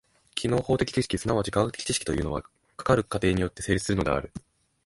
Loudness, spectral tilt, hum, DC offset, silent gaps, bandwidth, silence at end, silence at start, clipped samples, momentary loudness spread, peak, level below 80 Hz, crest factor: -27 LUFS; -5 dB/octave; none; under 0.1%; none; 11.5 kHz; 0.45 s; 0.35 s; under 0.1%; 10 LU; -8 dBFS; -44 dBFS; 20 dB